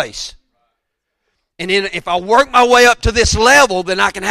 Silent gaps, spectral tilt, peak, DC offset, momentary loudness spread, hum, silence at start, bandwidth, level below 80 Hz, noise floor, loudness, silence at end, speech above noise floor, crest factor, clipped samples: none; -3 dB/octave; 0 dBFS; under 0.1%; 14 LU; none; 0 s; 15.5 kHz; -30 dBFS; -74 dBFS; -12 LUFS; 0 s; 61 dB; 14 dB; under 0.1%